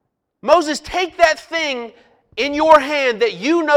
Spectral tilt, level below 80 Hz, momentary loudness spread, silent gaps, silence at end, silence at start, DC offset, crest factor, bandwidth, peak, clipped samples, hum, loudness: -3 dB/octave; -50 dBFS; 15 LU; none; 0 s; 0.45 s; under 0.1%; 16 dB; 14.5 kHz; 0 dBFS; under 0.1%; none; -16 LUFS